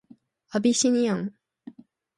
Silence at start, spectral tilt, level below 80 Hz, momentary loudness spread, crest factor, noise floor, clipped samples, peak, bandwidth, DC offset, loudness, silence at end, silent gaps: 0.55 s; -4 dB/octave; -72 dBFS; 10 LU; 16 dB; -56 dBFS; under 0.1%; -10 dBFS; 11.5 kHz; under 0.1%; -24 LUFS; 0.45 s; none